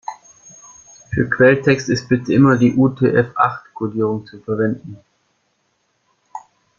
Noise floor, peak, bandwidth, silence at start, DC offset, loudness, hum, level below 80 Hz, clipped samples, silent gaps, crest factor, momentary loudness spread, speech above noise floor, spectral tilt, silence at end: -66 dBFS; -2 dBFS; 7.4 kHz; 0.1 s; under 0.1%; -17 LUFS; none; -50 dBFS; under 0.1%; none; 16 dB; 22 LU; 50 dB; -7 dB/octave; 0.4 s